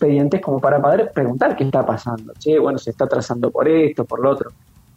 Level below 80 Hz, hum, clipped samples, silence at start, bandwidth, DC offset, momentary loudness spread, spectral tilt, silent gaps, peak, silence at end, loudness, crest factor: -56 dBFS; none; under 0.1%; 0 s; 8.4 kHz; under 0.1%; 8 LU; -8 dB/octave; none; -2 dBFS; 0.45 s; -18 LUFS; 16 dB